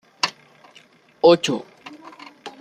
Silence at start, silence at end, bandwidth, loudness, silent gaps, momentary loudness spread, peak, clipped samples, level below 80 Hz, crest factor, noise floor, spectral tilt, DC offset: 0.25 s; 0.1 s; 12.5 kHz; -19 LUFS; none; 25 LU; -2 dBFS; under 0.1%; -68 dBFS; 20 dB; -52 dBFS; -4 dB/octave; under 0.1%